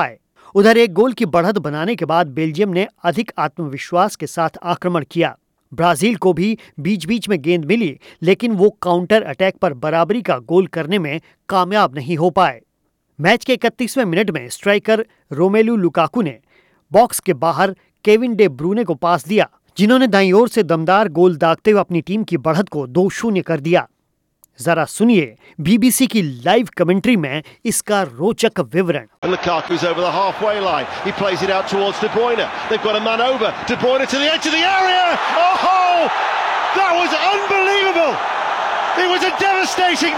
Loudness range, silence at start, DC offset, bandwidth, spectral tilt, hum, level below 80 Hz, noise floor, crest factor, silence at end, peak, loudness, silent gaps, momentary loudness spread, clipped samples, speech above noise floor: 4 LU; 0 s; under 0.1%; 17.5 kHz; -5 dB/octave; none; -56 dBFS; -67 dBFS; 14 dB; 0 s; -2 dBFS; -16 LUFS; 29.18-29.22 s; 7 LU; under 0.1%; 51 dB